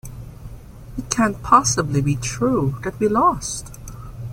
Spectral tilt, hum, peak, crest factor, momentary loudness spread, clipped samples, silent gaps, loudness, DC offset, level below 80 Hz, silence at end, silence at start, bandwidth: -5 dB/octave; none; -2 dBFS; 20 dB; 22 LU; under 0.1%; none; -19 LUFS; under 0.1%; -40 dBFS; 0 s; 0.05 s; 16.5 kHz